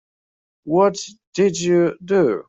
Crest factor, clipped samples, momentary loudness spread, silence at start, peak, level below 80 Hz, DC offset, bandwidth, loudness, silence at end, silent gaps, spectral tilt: 16 dB; under 0.1%; 12 LU; 0.65 s; -4 dBFS; -62 dBFS; under 0.1%; 8 kHz; -19 LUFS; 0.05 s; 1.27-1.32 s; -5.5 dB/octave